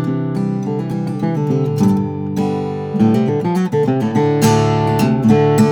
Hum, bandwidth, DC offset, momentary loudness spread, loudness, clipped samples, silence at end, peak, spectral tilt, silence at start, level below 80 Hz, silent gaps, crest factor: none; over 20 kHz; under 0.1%; 8 LU; -16 LUFS; under 0.1%; 0 s; 0 dBFS; -7.5 dB/octave; 0 s; -48 dBFS; none; 14 dB